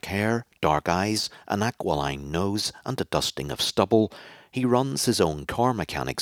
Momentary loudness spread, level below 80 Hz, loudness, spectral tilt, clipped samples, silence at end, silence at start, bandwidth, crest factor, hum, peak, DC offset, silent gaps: 6 LU; -50 dBFS; -25 LUFS; -4.5 dB/octave; under 0.1%; 0 s; 0.05 s; 17.5 kHz; 22 dB; none; -4 dBFS; under 0.1%; none